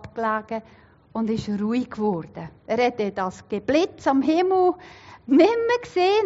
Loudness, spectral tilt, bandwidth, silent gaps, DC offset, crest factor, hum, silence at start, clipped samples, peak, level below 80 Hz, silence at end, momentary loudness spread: -23 LUFS; -4.5 dB/octave; 7.8 kHz; none; under 0.1%; 18 dB; none; 0.05 s; under 0.1%; -6 dBFS; -58 dBFS; 0 s; 15 LU